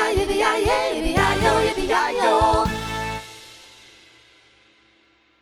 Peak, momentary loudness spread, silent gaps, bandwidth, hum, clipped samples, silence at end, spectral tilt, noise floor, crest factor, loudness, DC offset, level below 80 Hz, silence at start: -4 dBFS; 14 LU; none; 16.5 kHz; none; under 0.1%; 1.85 s; -4.5 dB/octave; -59 dBFS; 18 dB; -20 LUFS; under 0.1%; -36 dBFS; 0 s